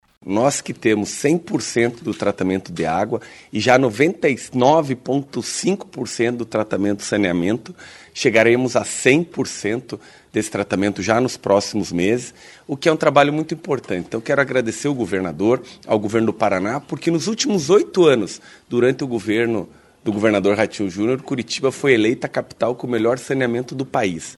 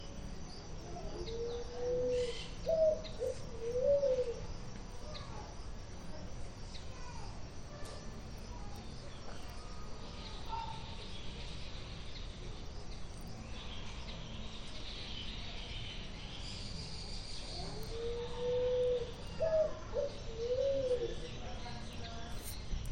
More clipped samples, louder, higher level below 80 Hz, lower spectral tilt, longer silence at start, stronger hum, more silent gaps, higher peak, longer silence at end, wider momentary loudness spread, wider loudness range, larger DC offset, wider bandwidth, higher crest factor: neither; first, -19 LUFS vs -41 LUFS; second, -58 dBFS vs -48 dBFS; about the same, -5 dB/octave vs -5 dB/octave; first, 0.25 s vs 0 s; neither; neither; first, 0 dBFS vs -22 dBFS; about the same, 0.05 s vs 0 s; second, 9 LU vs 15 LU; second, 2 LU vs 12 LU; neither; second, 12.5 kHz vs 17 kHz; about the same, 20 dB vs 16 dB